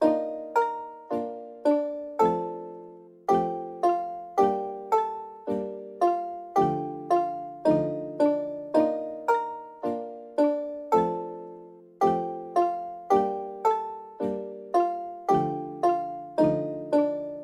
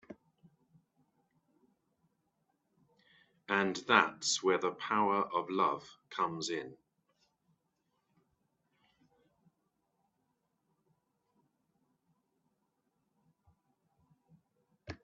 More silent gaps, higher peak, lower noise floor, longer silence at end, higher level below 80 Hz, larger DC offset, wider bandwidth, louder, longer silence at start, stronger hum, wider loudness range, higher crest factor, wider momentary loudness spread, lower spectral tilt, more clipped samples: neither; about the same, -10 dBFS vs -8 dBFS; second, -47 dBFS vs -81 dBFS; about the same, 0 s vs 0.1 s; first, -64 dBFS vs -78 dBFS; neither; first, 14 kHz vs 8 kHz; first, -27 LUFS vs -32 LUFS; about the same, 0 s vs 0.1 s; neither; second, 2 LU vs 11 LU; second, 16 dB vs 32 dB; second, 10 LU vs 14 LU; first, -7.5 dB/octave vs -2 dB/octave; neither